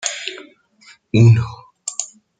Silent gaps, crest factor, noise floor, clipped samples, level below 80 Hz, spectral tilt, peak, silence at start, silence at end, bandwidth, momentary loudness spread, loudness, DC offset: none; 16 dB; -50 dBFS; under 0.1%; -52 dBFS; -5.5 dB/octave; -2 dBFS; 0.05 s; 0.35 s; 9.4 kHz; 17 LU; -17 LUFS; under 0.1%